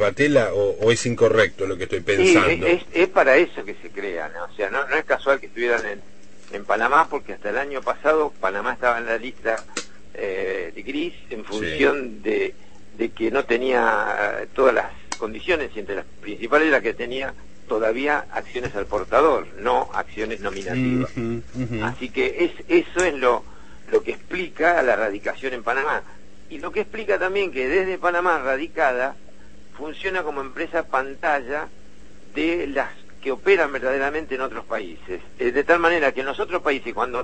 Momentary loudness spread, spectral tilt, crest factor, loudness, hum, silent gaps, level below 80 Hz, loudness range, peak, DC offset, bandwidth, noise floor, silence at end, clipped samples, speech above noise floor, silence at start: 12 LU; -4.5 dB/octave; 20 dB; -22 LUFS; none; none; -50 dBFS; 6 LU; -2 dBFS; 2%; 8.8 kHz; -49 dBFS; 0 s; under 0.1%; 27 dB; 0 s